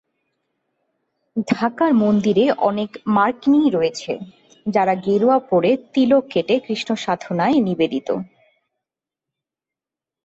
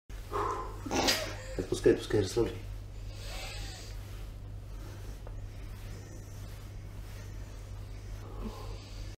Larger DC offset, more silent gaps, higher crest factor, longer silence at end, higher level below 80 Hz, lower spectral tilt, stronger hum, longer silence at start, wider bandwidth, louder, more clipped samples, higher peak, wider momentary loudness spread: neither; neither; second, 16 dB vs 24 dB; first, 2 s vs 0 s; second, -62 dBFS vs -44 dBFS; first, -6.5 dB/octave vs -4.5 dB/octave; neither; first, 1.35 s vs 0.1 s; second, 8 kHz vs 16 kHz; first, -19 LUFS vs -36 LUFS; neither; first, -4 dBFS vs -12 dBFS; second, 11 LU vs 17 LU